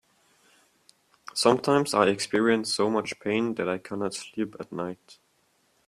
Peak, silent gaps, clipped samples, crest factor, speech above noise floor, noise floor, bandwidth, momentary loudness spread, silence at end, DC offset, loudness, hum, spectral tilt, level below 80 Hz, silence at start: -4 dBFS; none; under 0.1%; 24 dB; 42 dB; -68 dBFS; 14.5 kHz; 12 LU; 0.75 s; under 0.1%; -26 LUFS; none; -4 dB/octave; -68 dBFS; 1.35 s